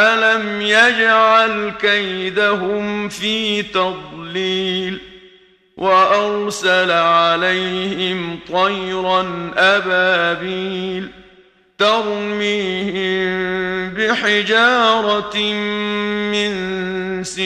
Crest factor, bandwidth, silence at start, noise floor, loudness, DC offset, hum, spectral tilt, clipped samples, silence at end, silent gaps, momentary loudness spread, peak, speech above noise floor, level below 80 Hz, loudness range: 18 dB; 13.5 kHz; 0 s; -50 dBFS; -16 LUFS; under 0.1%; none; -4 dB/octave; under 0.1%; 0 s; none; 10 LU; 0 dBFS; 34 dB; -54 dBFS; 5 LU